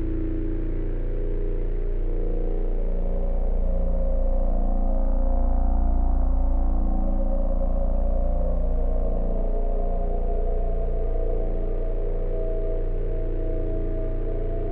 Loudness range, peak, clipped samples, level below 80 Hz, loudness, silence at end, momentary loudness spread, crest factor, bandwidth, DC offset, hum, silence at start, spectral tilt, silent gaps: 3 LU; -12 dBFS; under 0.1%; -22 dBFS; -29 LUFS; 0 s; 4 LU; 10 dB; 2.3 kHz; under 0.1%; none; 0 s; -12 dB/octave; none